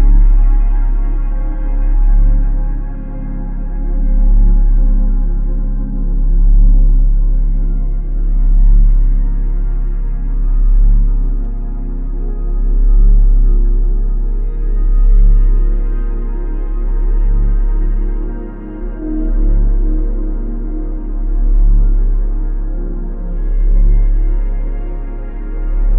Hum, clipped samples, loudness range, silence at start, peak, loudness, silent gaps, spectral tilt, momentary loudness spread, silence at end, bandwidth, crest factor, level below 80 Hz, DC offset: none; under 0.1%; 4 LU; 0 s; -2 dBFS; -18 LUFS; none; -13.5 dB/octave; 11 LU; 0 s; 1.7 kHz; 10 dB; -10 dBFS; under 0.1%